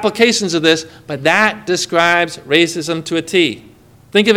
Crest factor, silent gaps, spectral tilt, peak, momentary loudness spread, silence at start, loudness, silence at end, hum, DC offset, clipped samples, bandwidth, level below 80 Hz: 16 dB; none; -3.5 dB/octave; 0 dBFS; 7 LU; 0 s; -14 LUFS; 0 s; none; under 0.1%; 0.1%; 16.5 kHz; -56 dBFS